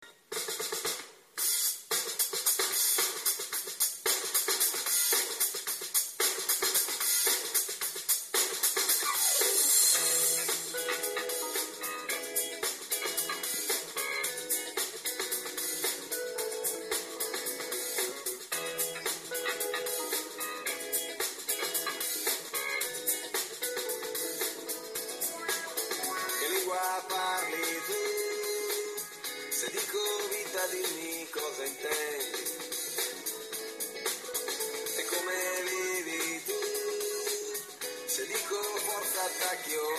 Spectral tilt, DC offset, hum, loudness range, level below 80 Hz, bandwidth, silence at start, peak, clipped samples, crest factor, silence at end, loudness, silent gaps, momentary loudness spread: 1 dB/octave; under 0.1%; none; 7 LU; -80 dBFS; 15.5 kHz; 0 s; -12 dBFS; under 0.1%; 22 dB; 0 s; -30 LUFS; none; 9 LU